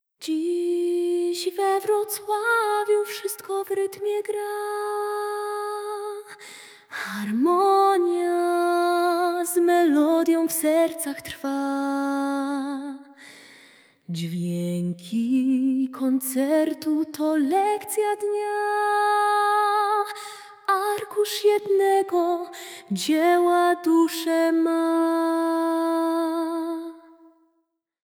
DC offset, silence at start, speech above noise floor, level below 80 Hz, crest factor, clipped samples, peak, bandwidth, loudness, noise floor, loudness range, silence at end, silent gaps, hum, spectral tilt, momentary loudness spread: under 0.1%; 0.2 s; 51 dB; -76 dBFS; 14 dB; under 0.1%; -8 dBFS; 19 kHz; -23 LUFS; -74 dBFS; 7 LU; 1.1 s; none; none; -4.5 dB/octave; 11 LU